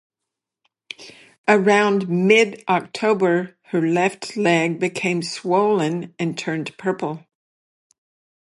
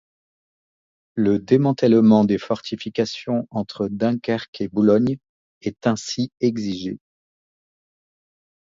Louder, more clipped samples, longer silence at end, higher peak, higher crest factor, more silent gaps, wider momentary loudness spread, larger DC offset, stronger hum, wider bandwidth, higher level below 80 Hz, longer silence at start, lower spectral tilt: about the same, -20 LUFS vs -21 LUFS; neither; second, 1.3 s vs 1.65 s; about the same, -2 dBFS vs -2 dBFS; about the same, 18 dB vs 20 dB; second, 1.38-1.44 s vs 4.48-4.53 s, 5.29-5.61 s; second, 11 LU vs 14 LU; neither; neither; first, 11.5 kHz vs 7.6 kHz; second, -72 dBFS vs -58 dBFS; second, 1 s vs 1.15 s; about the same, -5.5 dB/octave vs -6.5 dB/octave